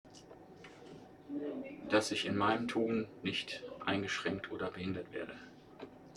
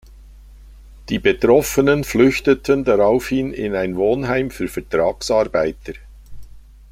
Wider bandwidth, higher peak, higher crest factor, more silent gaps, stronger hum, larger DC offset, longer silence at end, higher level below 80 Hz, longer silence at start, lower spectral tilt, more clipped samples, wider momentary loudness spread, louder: second, 13.5 kHz vs 16 kHz; second, -16 dBFS vs -2 dBFS; about the same, 22 dB vs 18 dB; neither; neither; neither; second, 0 s vs 0.3 s; second, -70 dBFS vs -40 dBFS; about the same, 0.05 s vs 0.1 s; about the same, -4.5 dB/octave vs -5.5 dB/octave; neither; first, 22 LU vs 10 LU; second, -37 LUFS vs -18 LUFS